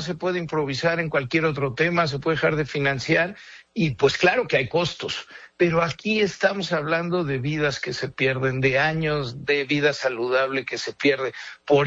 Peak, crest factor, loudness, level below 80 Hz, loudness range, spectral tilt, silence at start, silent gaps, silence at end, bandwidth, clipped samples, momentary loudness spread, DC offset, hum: -6 dBFS; 16 dB; -23 LUFS; -54 dBFS; 1 LU; -5.5 dB/octave; 0 s; none; 0 s; 8 kHz; under 0.1%; 7 LU; under 0.1%; none